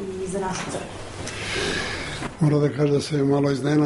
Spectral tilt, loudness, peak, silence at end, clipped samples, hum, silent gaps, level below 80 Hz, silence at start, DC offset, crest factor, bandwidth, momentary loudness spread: -5.5 dB/octave; -24 LUFS; -10 dBFS; 0 s; under 0.1%; none; none; -46 dBFS; 0 s; under 0.1%; 14 dB; 11.5 kHz; 11 LU